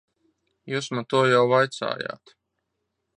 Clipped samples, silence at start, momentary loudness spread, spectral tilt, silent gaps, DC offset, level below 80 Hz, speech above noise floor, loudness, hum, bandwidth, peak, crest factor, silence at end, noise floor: under 0.1%; 0.65 s; 14 LU; -5 dB/octave; none; under 0.1%; -72 dBFS; 56 dB; -23 LUFS; none; 10.5 kHz; -6 dBFS; 18 dB; 1.1 s; -79 dBFS